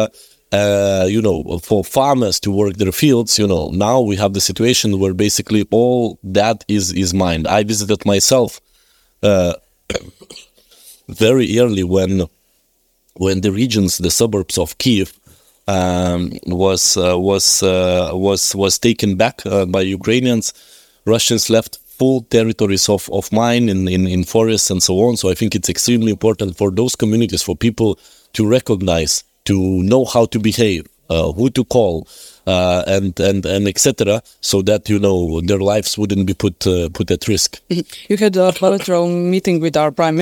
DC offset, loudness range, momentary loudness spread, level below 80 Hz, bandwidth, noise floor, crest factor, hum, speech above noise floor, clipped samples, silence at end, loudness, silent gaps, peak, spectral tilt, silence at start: under 0.1%; 3 LU; 6 LU; -44 dBFS; 19.5 kHz; -61 dBFS; 16 dB; none; 46 dB; under 0.1%; 0 s; -15 LUFS; none; 0 dBFS; -4.5 dB/octave; 0 s